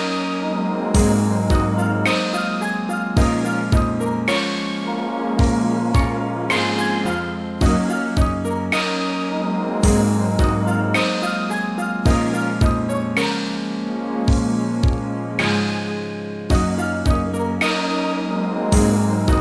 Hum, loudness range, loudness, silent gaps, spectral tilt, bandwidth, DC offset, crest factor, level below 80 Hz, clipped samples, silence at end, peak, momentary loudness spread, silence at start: none; 2 LU; -20 LUFS; none; -5.5 dB/octave; 11 kHz; 0.1%; 18 dB; -28 dBFS; under 0.1%; 0 s; -2 dBFS; 6 LU; 0 s